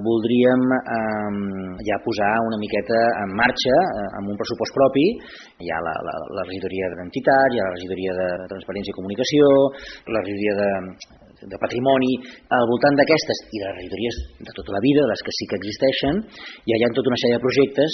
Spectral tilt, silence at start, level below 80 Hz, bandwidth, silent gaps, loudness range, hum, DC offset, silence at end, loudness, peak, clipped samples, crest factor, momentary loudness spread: -4 dB/octave; 0 s; -48 dBFS; 6.4 kHz; none; 3 LU; none; under 0.1%; 0 s; -21 LUFS; -4 dBFS; under 0.1%; 18 dB; 12 LU